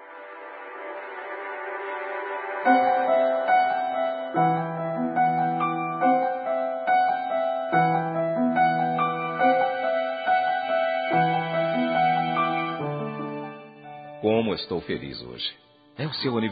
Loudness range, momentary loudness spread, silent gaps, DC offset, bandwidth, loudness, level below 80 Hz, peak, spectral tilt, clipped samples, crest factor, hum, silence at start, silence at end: 5 LU; 14 LU; none; under 0.1%; 4.9 kHz; -25 LUFS; -68 dBFS; -6 dBFS; -3.5 dB/octave; under 0.1%; 18 dB; none; 0 s; 0 s